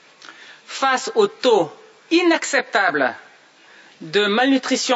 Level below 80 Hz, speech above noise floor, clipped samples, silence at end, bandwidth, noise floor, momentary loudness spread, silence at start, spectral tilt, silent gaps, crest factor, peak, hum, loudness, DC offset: -76 dBFS; 31 dB; under 0.1%; 0 s; 8 kHz; -49 dBFS; 9 LU; 0.25 s; -2.5 dB/octave; none; 16 dB; -4 dBFS; none; -19 LUFS; under 0.1%